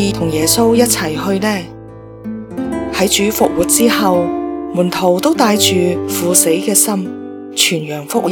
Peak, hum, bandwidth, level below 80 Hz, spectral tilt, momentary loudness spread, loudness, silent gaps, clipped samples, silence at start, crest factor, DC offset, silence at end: 0 dBFS; none; over 20 kHz; -42 dBFS; -3.5 dB/octave; 13 LU; -13 LUFS; none; under 0.1%; 0 s; 14 dB; under 0.1%; 0 s